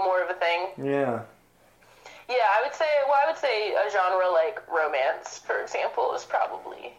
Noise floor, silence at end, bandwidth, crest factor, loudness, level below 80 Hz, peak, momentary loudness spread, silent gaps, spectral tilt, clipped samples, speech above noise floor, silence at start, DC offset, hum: -59 dBFS; 0.05 s; 11.5 kHz; 14 dB; -25 LUFS; -70 dBFS; -12 dBFS; 8 LU; none; -4 dB/octave; under 0.1%; 33 dB; 0 s; under 0.1%; none